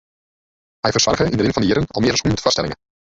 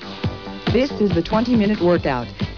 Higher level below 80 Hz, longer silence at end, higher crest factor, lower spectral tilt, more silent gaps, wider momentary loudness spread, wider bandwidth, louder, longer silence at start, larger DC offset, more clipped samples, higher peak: about the same, -40 dBFS vs -38 dBFS; first, 0.4 s vs 0 s; first, 18 dB vs 12 dB; second, -4 dB/octave vs -7.5 dB/octave; neither; second, 7 LU vs 10 LU; first, 8 kHz vs 5.4 kHz; about the same, -18 LUFS vs -20 LUFS; first, 0.85 s vs 0 s; second, under 0.1% vs 0.3%; neither; first, -2 dBFS vs -6 dBFS